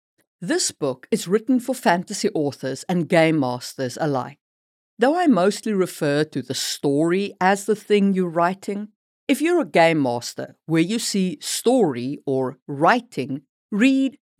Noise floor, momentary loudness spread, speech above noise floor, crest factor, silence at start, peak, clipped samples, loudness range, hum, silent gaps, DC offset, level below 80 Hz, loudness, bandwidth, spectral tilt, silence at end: under -90 dBFS; 11 LU; over 69 dB; 18 dB; 0.4 s; -4 dBFS; under 0.1%; 2 LU; none; 4.41-4.97 s, 8.96-9.27 s, 12.62-12.66 s, 13.49-13.69 s; under 0.1%; -82 dBFS; -21 LUFS; 16 kHz; -5 dB/octave; 0.3 s